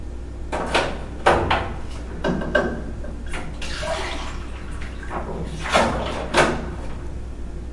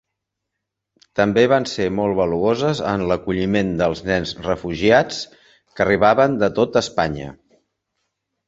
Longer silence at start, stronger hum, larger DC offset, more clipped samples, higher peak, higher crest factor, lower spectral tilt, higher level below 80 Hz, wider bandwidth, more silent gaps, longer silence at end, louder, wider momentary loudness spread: second, 0 s vs 1.15 s; neither; neither; neither; about the same, 0 dBFS vs -2 dBFS; first, 24 dB vs 18 dB; about the same, -4.5 dB/octave vs -5.5 dB/octave; first, -32 dBFS vs -46 dBFS; first, 11.5 kHz vs 8 kHz; neither; second, 0 s vs 1.15 s; second, -24 LUFS vs -19 LUFS; first, 15 LU vs 9 LU